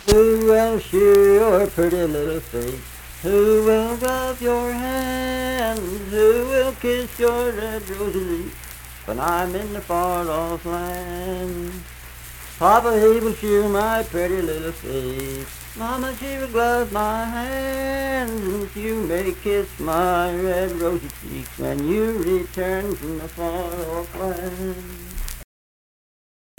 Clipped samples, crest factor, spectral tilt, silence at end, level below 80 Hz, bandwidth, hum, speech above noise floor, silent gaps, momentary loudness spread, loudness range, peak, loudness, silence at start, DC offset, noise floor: under 0.1%; 20 dB; -5 dB/octave; 1.15 s; -36 dBFS; 19 kHz; none; over 69 dB; none; 15 LU; 6 LU; 0 dBFS; -21 LUFS; 0 s; under 0.1%; under -90 dBFS